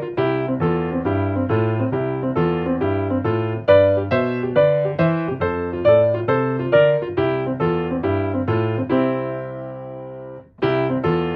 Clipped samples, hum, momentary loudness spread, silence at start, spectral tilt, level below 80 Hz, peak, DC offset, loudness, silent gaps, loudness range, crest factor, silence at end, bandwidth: under 0.1%; none; 9 LU; 0 s; -10.5 dB/octave; -48 dBFS; -2 dBFS; under 0.1%; -19 LUFS; none; 5 LU; 16 dB; 0 s; 5.4 kHz